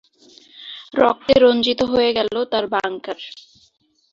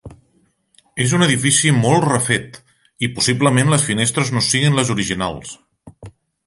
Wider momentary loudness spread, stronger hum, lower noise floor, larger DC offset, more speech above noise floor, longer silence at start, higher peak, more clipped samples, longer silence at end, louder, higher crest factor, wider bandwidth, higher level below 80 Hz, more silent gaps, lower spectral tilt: first, 21 LU vs 11 LU; neither; second, -50 dBFS vs -61 dBFS; neither; second, 32 dB vs 44 dB; first, 0.6 s vs 0.05 s; about the same, -2 dBFS vs 0 dBFS; neither; first, 0.8 s vs 0.4 s; about the same, -18 LUFS vs -16 LUFS; about the same, 18 dB vs 18 dB; second, 7.4 kHz vs 11.5 kHz; about the same, -52 dBFS vs -48 dBFS; neither; about the same, -5 dB/octave vs -4 dB/octave